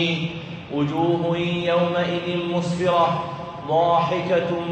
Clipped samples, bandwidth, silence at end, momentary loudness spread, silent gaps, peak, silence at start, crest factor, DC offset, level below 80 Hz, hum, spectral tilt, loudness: under 0.1%; 8.4 kHz; 0 s; 10 LU; none; -6 dBFS; 0 s; 16 dB; under 0.1%; -56 dBFS; none; -6.5 dB/octave; -22 LUFS